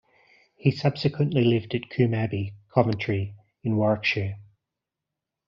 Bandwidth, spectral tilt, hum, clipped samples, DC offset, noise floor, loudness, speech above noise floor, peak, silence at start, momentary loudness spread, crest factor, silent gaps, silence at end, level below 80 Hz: 7.2 kHz; -6 dB/octave; none; under 0.1%; under 0.1%; -86 dBFS; -25 LUFS; 62 dB; -4 dBFS; 0.65 s; 10 LU; 22 dB; none; 1.05 s; -60 dBFS